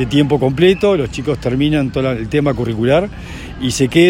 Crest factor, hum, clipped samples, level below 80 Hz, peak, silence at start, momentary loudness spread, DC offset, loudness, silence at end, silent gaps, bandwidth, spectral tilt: 14 dB; none; under 0.1%; -34 dBFS; 0 dBFS; 0 s; 9 LU; under 0.1%; -15 LUFS; 0 s; none; 16 kHz; -6 dB/octave